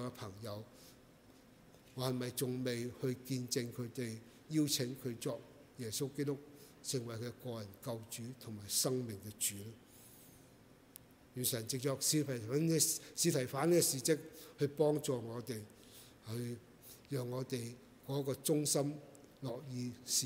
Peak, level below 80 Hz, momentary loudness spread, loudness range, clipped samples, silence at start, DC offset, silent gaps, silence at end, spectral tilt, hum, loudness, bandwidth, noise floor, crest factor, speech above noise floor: -18 dBFS; -74 dBFS; 21 LU; 9 LU; under 0.1%; 0 s; under 0.1%; none; 0 s; -4 dB/octave; none; -38 LUFS; 16 kHz; -63 dBFS; 22 dB; 24 dB